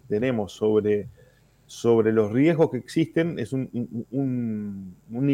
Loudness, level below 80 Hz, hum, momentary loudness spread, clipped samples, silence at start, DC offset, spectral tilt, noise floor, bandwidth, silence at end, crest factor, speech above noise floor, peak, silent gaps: -24 LUFS; -62 dBFS; none; 13 LU; under 0.1%; 0.1 s; under 0.1%; -7.5 dB/octave; -56 dBFS; 12.5 kHz; 0 s; 16 dB; 33 dB; -8 dBFS; none